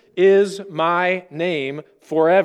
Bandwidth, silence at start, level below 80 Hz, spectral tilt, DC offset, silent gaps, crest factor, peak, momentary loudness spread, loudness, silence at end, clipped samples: 10.5 kHz; 0.15 s; -72 dBFS; -6 dB/octave; under 0.1%; none; 16 dB; -4 dBFS; 10 LU; -19 LUFS; 0 s; under 0.1%